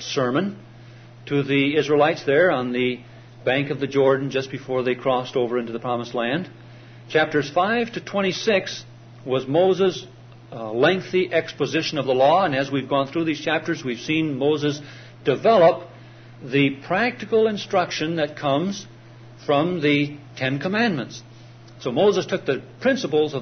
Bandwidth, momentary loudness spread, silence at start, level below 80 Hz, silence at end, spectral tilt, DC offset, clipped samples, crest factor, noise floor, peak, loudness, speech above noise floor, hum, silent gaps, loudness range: 6.6 kHz; 11 LU; 0 s; -62 dBFS; 0 s; -5.5 dB/octave; under 0.1%; under 0.1%; 16 dB; -44 dBFS; -6 dBFS; -22 LUFS; 23 dB; none; none; 3 LU